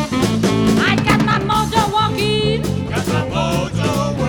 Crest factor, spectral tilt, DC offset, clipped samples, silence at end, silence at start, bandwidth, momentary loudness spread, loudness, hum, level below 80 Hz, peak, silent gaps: 16 dB; -5.5 dB/octave; under 0.1%; under 0.1%; 0 s; 0 s; 17.5 kHz; 5 LU; -17 LUFS; none; -34 dBFS; -2 dBFS; none